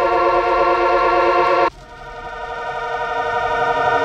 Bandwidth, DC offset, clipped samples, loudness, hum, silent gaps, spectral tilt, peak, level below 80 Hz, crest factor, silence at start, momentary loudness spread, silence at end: 9 kHz; under 0.1%; under 0.1%; -17 LUFS; none; none; -5 dB/octave; -4 dBFS; -42 dBFS; 14 dB; 0 s; 15 LU; 0 s